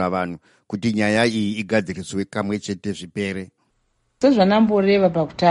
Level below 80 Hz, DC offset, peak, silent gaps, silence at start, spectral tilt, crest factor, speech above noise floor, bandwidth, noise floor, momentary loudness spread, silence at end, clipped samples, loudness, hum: -56 dBFS; under 0.1%; -4 dBFS; none; 0 s; -6 dB/octave; 16 dB; 48 dB; 11.5 kHz; -67 dBFS; 13 LU; 0 s; under 0.1%; -20 LUFS; none